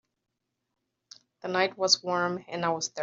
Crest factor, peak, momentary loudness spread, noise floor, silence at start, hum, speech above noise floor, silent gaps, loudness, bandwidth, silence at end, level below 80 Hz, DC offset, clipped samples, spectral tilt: 22 dB; -8 dBFS; 8 LU; -83 dBFS; 1.45 s; none; 55 dB; none; -27 LUFS; 7.8 kHz; 0 s; -78 dBFS; under 0.1%; under 0.1%; -1.5 dB/octave